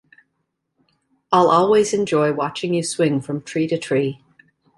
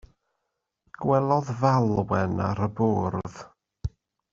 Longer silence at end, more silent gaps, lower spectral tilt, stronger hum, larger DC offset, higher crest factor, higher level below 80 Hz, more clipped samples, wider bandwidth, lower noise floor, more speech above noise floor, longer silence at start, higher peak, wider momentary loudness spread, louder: first, 0.65 s vs 0.45 s; neither; second, -5.5 dB/octave vs -8 dB/octave; neither; neither; about the same, 18 dB vs 20 dB; second, -62 dBFS vs -50 dBFS; neither; first, 11.5 kHz vs 7.4 kHz; second, -74 dBFS vs -81 dBFS; about the same, 56 dB vs 57 dB; first, 1.3 s vs 1 s; first, -2 dBFS vs -6 dBFS; second, 10 LU vs 15 LU; first, -19 LUFS vs -25 LUFS